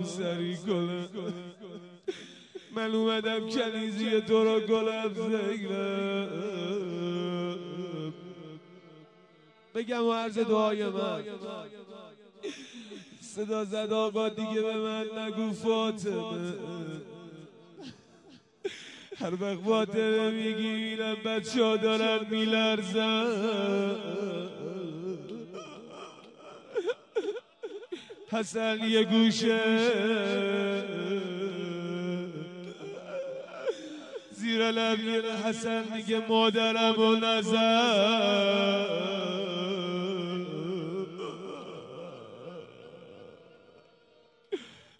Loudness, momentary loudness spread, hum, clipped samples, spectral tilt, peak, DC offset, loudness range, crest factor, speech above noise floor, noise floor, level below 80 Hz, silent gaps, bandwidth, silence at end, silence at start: -30 LUFS; 20 LU; none; under 0.1%; -5 dB/octave; -12 dBFS; under 0.1%; 12 LU; 18 dB; 34 dB; -62 dBFS; -82 dBFS; none; 11 kHz; 0.2 s; 0 s